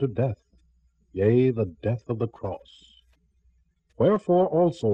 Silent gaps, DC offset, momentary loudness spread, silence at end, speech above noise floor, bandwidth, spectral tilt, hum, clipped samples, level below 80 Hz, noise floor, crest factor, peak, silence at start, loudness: none; under 0.1%; 15 LU; 0 s; 42 dB; 8.6 kHz; -9.5 dB/octave; none; under 0.1%; -58 dBFS; -65 dBFS; 16 dB; -10 dBFS; 0 s; -24 LUFS